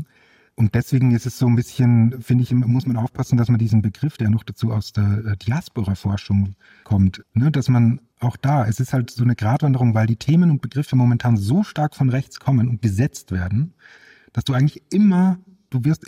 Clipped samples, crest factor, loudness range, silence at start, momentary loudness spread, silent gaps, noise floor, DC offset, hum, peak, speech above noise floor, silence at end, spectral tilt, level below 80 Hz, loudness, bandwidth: under 0.1%; 14 dB; 3 LU; 0 s; 7 LU; none; -56 dBFS; under 0.1%; none; -6 dBFS; 37 dB; 0.1 s; -8 dB/octave; -52 dBFS; -20 LUFS; 15 kHz